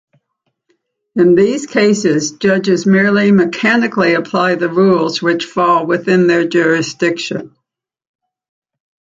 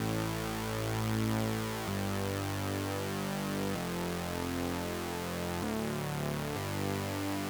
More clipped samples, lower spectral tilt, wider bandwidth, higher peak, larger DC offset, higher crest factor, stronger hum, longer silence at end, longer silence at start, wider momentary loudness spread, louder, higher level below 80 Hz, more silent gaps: neither; about the same, -5.5 dB/octave vs -5 dB/octave; second, 7.8 kHz vs over 20 kHz; first, -2 dBFS vs -18 dBFS; neither; second, 12 dB vs 18 dB; neither; first, 1.7 s vs 0 s; first, 1.15 s vs 0 s; first, 6 LU vs 3 LU; first, -13 LUFS vs -35 LUFS; second, -58 dBFS vs -52 dBFS; neither